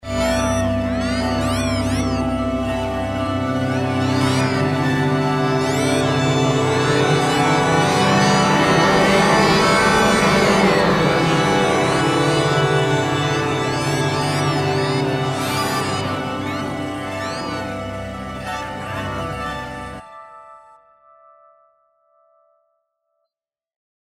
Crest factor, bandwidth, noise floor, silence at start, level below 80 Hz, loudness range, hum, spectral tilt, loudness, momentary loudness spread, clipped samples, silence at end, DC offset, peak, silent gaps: 16 dB; 16 kHz; -88 dBFS; 0.05 s; -40 dBFS; 13 LU; none; -5 dB/octave; -18 LUFS; 12 LU; under 0.1%; 3.55 s; under 0.1%; -4 dBFS; none